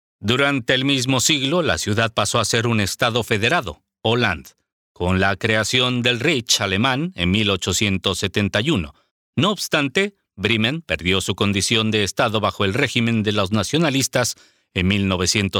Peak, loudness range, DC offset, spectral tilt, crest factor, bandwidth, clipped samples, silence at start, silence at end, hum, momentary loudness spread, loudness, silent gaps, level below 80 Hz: -2 dBFS; 2 LU; under 0.1%; -4 dB/octave; 18 dB; 18 kHz; under 0.1%; 0.2 s; 0 s; none; 5 LU; -19 LUFS; 4.72-4.95 s, 9.11-9.33 s; -46 dBFS